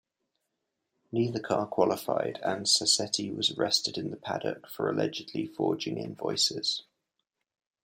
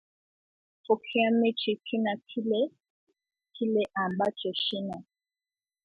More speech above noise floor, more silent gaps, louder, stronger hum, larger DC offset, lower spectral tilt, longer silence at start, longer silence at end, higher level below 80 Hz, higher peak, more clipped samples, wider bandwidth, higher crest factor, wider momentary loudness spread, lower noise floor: second, 53 dB vs over 62 dB; second, none vs 2.90-3.07 s; about the same, -29 LUFS vs -29 LUFS; neither; neither; second, -3 dB/octave vs -7 dB/octave; first, 1.1 s vs 0.9 s; first, 1.05 s vs 0.8 s; about the same, -74 dBFS vs -76 dBFS; about the same, -10 dBFS vs -12 dBFS; neither; first, 16 kHz vs 5 kHz; about the same, 22 dB vs 20 dB; about the same, 10 LU vs 8 LU; second, -83 dBFS vs under -90 dBFS